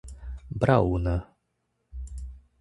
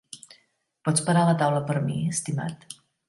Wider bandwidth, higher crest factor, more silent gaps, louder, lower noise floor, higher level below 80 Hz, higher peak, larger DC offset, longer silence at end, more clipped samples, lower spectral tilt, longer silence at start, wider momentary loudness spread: about the same, 11.5 kHz vs 11.5 kHz; first, 24 dB vs 18 dB; neither; about the same, -26 LUFS vs -25 LUFS; first, -76 dBFS vs -67 dBFS; first, -38 dBFS vs -64 dBFS; first, -4 dBFS vs -8 dBFS; neither; second, 0.2 s vs 0.35 s; neither; first, -8.5 dB/octave vs -5.5 dB/octave; about the same, 0.05 s vs 0.15 s; about the same, 21 LU vs 22 LU